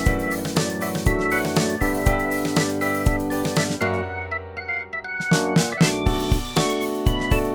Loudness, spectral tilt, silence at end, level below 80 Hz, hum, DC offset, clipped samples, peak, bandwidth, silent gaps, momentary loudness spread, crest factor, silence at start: -22 LUFS; -5 dB/octave; 0 s; -30 dBFS; none; under 0.1%; under 0.1%; -4 dBFS; over 20 kHz; none; 7 LU; 18 dB; 0 s